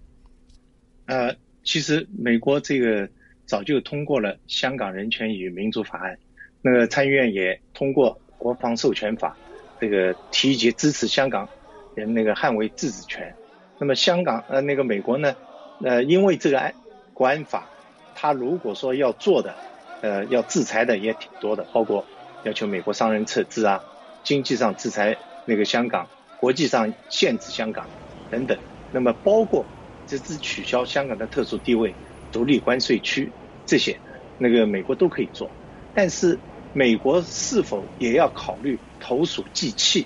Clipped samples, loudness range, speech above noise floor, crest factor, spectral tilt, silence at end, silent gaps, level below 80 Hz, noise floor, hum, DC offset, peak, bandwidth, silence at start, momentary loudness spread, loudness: under 0.1%; 3 LU; 34 dB; 18 dB; -4 dB/octave; 0 s; none; -54 dBFS; -56 dBFS; none; under 0.1%; -6 dBFS; 10.5 kHz; 1.1 s; 13 LU; -23 LUFS